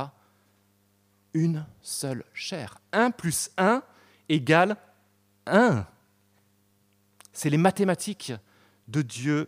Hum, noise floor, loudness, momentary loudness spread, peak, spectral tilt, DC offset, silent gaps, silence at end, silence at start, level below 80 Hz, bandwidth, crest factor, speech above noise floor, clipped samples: 50 Hz at -55 dBFS; -66 dBFS; -26 LUFS; 16 LU; -6 dBFS; -5 dB/octave; under 0.1%; none; 0 s; 0 s; -66 dBFS; 15.5 kHz; 22 dB; 41 dB; under 0.1%